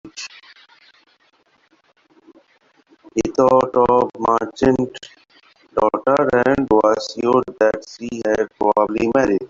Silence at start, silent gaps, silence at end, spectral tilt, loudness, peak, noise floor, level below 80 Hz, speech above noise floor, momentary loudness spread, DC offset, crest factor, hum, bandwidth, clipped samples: 0.05 s; none; 0.05 s; -6 dB/octave; -18 LUFS; -2 dBFS; -59 dBFS; -50 dBFS; 42 dB; 12 LU; under 0.1%; 16 dB; none; 7.6 kHz; under 0.1%